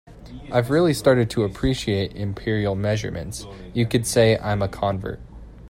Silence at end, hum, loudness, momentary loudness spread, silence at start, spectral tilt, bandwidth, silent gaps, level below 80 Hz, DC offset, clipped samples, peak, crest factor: 0 s; none; -22 LUFS; 15 LU; 0.05 s; -5.5 dB/octave; 16.5 kHz; none; -40 dBFS; under 0.1%; under 0.1%; -4 dBFS; 18 dB